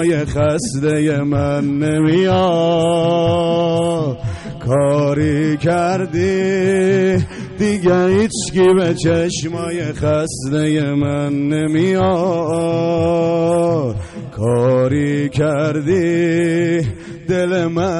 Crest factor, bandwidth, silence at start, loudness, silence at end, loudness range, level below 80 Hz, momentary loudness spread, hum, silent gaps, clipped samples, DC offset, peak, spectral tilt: 10 dB; 11.5 kHz; 0 s; -16 LUFS; 0 s; 2 LU; -42 dBFS; 6 LU; none; none; under 0.1%; under 0.1%; -6 dBFS; -6.5 dB/octave